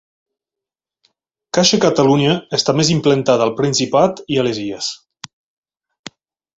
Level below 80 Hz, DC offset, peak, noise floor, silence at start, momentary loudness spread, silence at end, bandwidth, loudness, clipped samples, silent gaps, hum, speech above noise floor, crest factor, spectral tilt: -54 dBFS; under 0.1%; 0 dBFS; -87 dBFS; 1.55 s; 9 LU; 1.6 s; 8.2 kHz; -15 LUFS; under 0.1%; none; none; 72 dB; 18 dB; -4.5 dB/octave